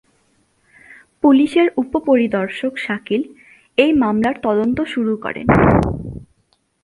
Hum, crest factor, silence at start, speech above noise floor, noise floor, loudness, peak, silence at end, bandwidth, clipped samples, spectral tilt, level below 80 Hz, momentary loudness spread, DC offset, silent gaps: none; 18 dB; 0.9 s; 47 dB; -63 dBFS; -17 LUFS; 0 dBFS; 0.6 s; 11.5 kHz; under 0.1%; -8 dB/octave; -38 dBFS; 11 LU; under 0.1%; none